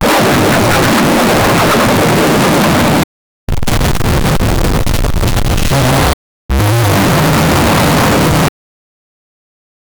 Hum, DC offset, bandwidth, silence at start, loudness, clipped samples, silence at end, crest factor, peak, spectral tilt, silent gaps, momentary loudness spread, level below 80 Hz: none; under 0.1%; over 20 kHz; 0 s; -11 LUFS; under 0.1%; 1.5 s; 10 dB; 0 dBFS; -5 dB/octave; 3.04-3.47 s, 6.13-6.49 s; 6 LU; -20 dBFS